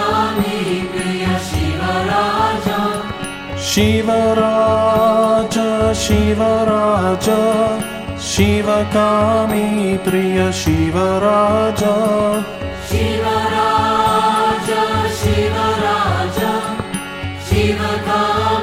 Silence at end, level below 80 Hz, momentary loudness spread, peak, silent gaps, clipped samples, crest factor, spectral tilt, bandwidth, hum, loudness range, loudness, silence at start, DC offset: 0 s; -34 dBFS; 7 LU; -2 dBFS; none; under 0.1%; 14 dB; -5 dB/octave; 16.5 kHz; none; 3 LU; -16 LUFS; 0 s; under 0.1%